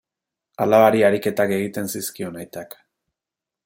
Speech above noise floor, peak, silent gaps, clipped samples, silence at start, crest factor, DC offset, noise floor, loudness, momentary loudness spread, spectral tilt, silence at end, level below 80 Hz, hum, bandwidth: 68 dB; -2 dBFS; none; under 0.1%; 0.6 s; 20 dB; under 0.1%; -88 dBFS; -19 LUFS; 20 LU; -5 dB/octave; 1 s; -66 dBFS; none; 17 kHz